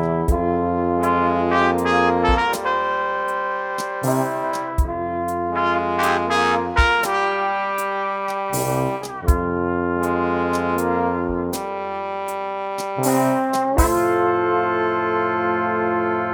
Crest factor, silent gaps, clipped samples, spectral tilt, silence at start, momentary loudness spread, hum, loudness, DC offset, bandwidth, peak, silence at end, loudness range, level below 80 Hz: 18 dB; none; under 0.1%; -5.5 dB/octave; 0 s; 7 LU; none; -21 LUFS; under 0.1%; over 20 kHz; -2 dBFS; 0 s; 3 LU; -32 dBFS